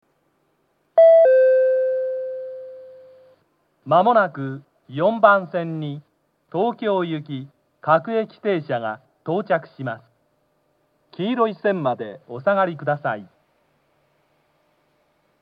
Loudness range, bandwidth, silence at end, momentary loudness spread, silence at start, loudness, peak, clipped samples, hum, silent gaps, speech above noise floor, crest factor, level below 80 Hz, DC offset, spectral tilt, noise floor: 8 LU; 5 kHz; 2.15 s; 18 LU; 0.95 s; -20 LUFS; 0 dBFS; under 0.1%; none; none; 46 dB; 22 dB; -84 dBFS; under 0.1%; -9 dB/octave; -67 dBFS